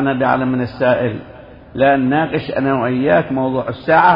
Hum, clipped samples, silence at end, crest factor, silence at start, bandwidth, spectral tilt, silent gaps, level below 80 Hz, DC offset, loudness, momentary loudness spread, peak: none; under 0.1%; 0 s; 16 dB; 0 s; 5.4 kHz; -10 dB/octave; none; -46 dBFS; under 0.1%; -16 LUFS; 7 LU; 0 dBFS